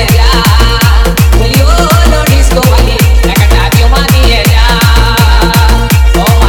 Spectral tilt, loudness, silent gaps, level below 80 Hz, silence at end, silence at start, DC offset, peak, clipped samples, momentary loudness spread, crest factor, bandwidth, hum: -5 dB/octave; -7 LUFS; none; -8 dBFS; 0 s; 0 s; under 0.1%; 0 dBFS; 8%; 1 LU; 4 dB; 19.5 kHz; none